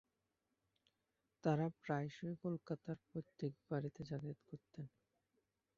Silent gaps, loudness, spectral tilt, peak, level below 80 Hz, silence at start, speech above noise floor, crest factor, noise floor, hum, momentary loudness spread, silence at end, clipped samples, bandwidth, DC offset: none; -45 LUFS; -7.5 dB/octave; -24 dBFS; -78 dBFS; 1.45 s; 44 dB; 22 dB; -88 dBFS; none; 15 LU; 0.9 s; under 0.1%; 7.2 kHz; under 0.1%